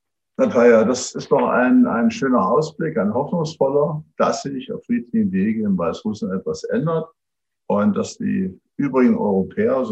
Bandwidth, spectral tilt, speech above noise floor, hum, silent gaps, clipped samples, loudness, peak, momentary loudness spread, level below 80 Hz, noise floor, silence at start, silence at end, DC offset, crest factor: 8.4 kHz; -6.5 dB/octave; 66 dB; none; none; under 0.1%; -19 LUFS; -2 dBFS; 10 LU; -64 dBFS; -85 dBFS; 0.4 s; 0 s; under 0.1%; 16 dB